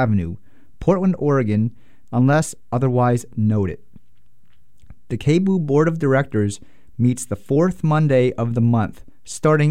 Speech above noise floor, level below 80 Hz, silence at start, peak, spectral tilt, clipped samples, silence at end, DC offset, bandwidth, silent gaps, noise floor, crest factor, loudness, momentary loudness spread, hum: 43 dB; -46 dBFS; 0 s; -4 dBFS; -7.5 dB/octave; under 0.1%; 0 s; 1%; 14 kHz; none; -61 dBFS; 14 dB; -19 LUFS; 10 LU; none